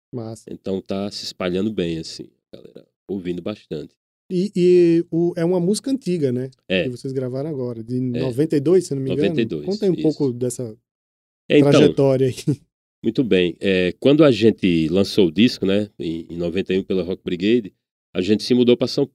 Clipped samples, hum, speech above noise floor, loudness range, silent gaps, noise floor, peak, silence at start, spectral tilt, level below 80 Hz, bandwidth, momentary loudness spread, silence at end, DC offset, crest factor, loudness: under 0.1%; none; over 71 dB; 9 LU; 2.96-3.06 s, 3.97-4.29 s, 10.91-11.49 s, 12.73-13.02 s, 17.91-18.13 s; under -90 dBFS; -2 dBFS; 0.15 s; -6.5 dB/octave; -56 dBFS; 13 kHz; 14 LU; 0.05 s; under 0.1%; 18 dB; -20 LUFS